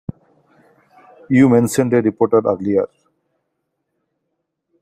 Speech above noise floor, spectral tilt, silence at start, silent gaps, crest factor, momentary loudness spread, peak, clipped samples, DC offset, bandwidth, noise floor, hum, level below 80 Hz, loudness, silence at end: 60 dB; -7 dB/octave; 0.1 s; none; 18 dB; 9 LU; -2 dBFS; under 0.1%; under 0.1%; 15 kHz; -74 dBFS; none; -56 dBFS; -15 LUFS; 1.95 s